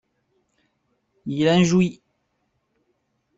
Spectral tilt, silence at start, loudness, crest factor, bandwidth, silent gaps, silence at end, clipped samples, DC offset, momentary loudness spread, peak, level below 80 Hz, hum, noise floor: -6 dB/octave; 1.25 s; -20 LUFS; 18 dB; 8 kHz; none; 1.45 s; under 0.1%; under 0.1%; 14 LU; -6 dBFS; -60 dBFS; none; -72 dBFS